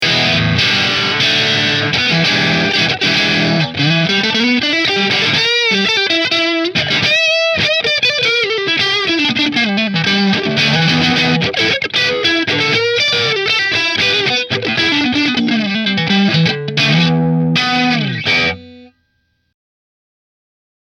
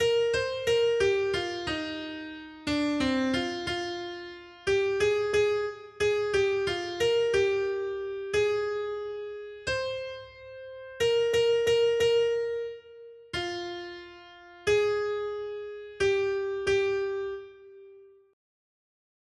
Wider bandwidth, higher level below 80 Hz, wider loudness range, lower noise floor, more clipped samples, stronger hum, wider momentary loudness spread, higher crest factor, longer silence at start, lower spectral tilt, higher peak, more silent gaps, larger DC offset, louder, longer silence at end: first, 14.5 kHz vs 12.5 kHz; first, -48 dBFS vs -58 dBFS; about the same, 2 LU vs 4 LU; first, -64 dBFS vs -53 dBFS; neither; neither; second, 3 LU vs 16 LU; about the same, 14 dB vs 14 dB; about the same, 0 s vs 0 s; about the same, -4 dB/octave vs -4 dB/octave; first, 0 dBFS vs -14 dBFS; neither; neither; first, -12 LUFS vs -28 LUFS; first, 2 s vs 1.25 s